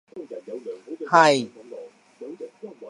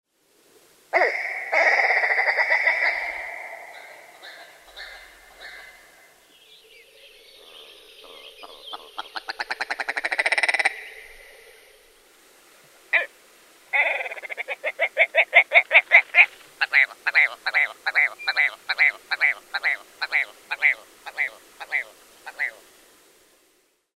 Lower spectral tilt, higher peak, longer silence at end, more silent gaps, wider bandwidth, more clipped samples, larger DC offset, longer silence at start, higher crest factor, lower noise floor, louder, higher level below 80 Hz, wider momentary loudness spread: first, -4 dB/octave vs 1 dB/octave; about the same, -2 dBFS vs -2 dBFS; second, 0 s vs 1.5 s; neither; second, 11.5 kHz vs 16 kHz; neither; neither; second, 0.15 s vs 0.95 s; about the same, 24 dB vs 24 dB; second, -42 dBFS vs -65 dBFS; about the same, -18 LUFS vs -20 LUFS; second, -82 dBFS vs -68 dBFS; about the same, 24 LU vs 25 LU